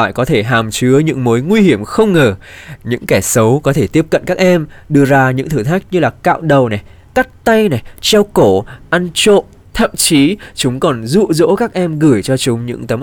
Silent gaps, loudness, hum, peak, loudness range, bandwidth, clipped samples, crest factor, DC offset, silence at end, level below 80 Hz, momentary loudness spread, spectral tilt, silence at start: none; -12 LUFS; none; -2 dBFS; 1 LU; over 20 kHz; under 0.1%; 10 dB; under 0.1%; 0 s; -38 dBFS; 7 LU; -5 dB/octave; 0 s